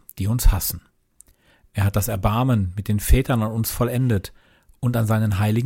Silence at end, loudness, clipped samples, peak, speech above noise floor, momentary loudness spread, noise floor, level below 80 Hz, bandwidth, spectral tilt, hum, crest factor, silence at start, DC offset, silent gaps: 0 s; -22 LUFS; under 0.1%; -4 dBFS; 37 dB; 7 LU; -57 dBFS; -28 dBFS; 17 kHz; -6 dB/octave; none; 18 dB; 0.15 s; under 0.1%; none